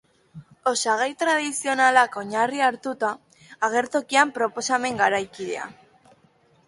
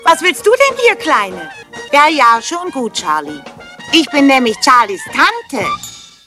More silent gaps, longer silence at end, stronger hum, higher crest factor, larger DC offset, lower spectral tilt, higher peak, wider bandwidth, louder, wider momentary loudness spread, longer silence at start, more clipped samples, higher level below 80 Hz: neither; first, 0.95 s vs 0.25 s; neither; first, 22 dB vs 12 dB; neither; about the same, -2 dB/octave vs -2 dB/octave; about the same, -2 dBFS vs 0 dBFS; second, 11.5 kHz vs 16 kHz; second, -23 LUFS vs -12 LUFS; second, 11 LU vs 18 LU; first, 0.35 s vs 0 s; second, under 0.1% vs 0.2%; second, -70 dBFS vs -54 dBFS